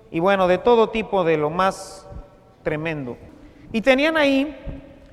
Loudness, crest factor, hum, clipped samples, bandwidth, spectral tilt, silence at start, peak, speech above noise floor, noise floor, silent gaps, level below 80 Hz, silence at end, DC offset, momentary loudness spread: -20 LUFS; 18 dB; none; under 0.1%; 14 kHz; -5.5 dB/octave; 0.1 s; -2 dBFS; 22 dB; -41 dBFS; none; -44 dBFS; 0.2 s; under 0.1%; 20 LU